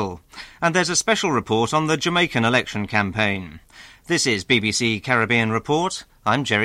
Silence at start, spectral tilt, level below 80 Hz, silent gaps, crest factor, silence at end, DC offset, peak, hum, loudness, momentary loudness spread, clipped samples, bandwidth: 0 s; -3.5 dB/octave; -52 dBFS; none; 18 dB; 0 s; under 0.1%; -4 dBFS; none; -20 LUFS; 8 LU; under 0.1%; 15.5 kHz